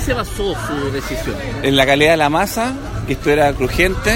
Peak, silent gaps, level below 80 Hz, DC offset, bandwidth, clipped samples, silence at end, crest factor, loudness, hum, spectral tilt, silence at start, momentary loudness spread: 0 dBFS; none; -28 dBFS; under 0.1%; 16.5 kHz; under 0.1%; 0 s; 16 dB; -16 LUFS; none; -4.5 dB/octave; 0 s; 11 LU